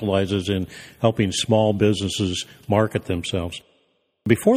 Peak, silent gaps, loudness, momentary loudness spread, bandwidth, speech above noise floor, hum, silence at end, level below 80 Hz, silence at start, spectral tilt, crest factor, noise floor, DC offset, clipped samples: -2 dBFS; none; -22 LUFS; 11 LU; 15.5 kHz; 45 dB; none; 0 s; -50 dBFS; 0 s; -5.5 dB/octave; 20 dB; -66 dBFS; under 0.1%; under 0.1%